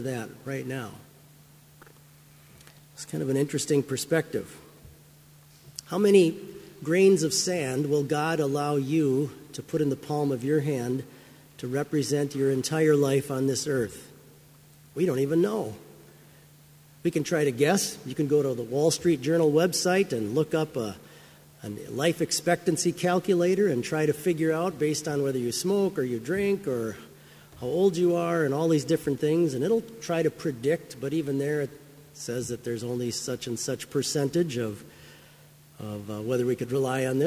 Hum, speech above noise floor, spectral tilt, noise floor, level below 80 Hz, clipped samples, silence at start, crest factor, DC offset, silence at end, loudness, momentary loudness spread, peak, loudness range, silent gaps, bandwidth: none; 28 dB; -5 dB/octave; -54 dBFS; -64 dBFS; under 0.1%; 0 s; 20 dB; under 0.1%; 0 s; -27 LUFS; 13 LU; -6 dBFS; 6 LU; none; 16 kHz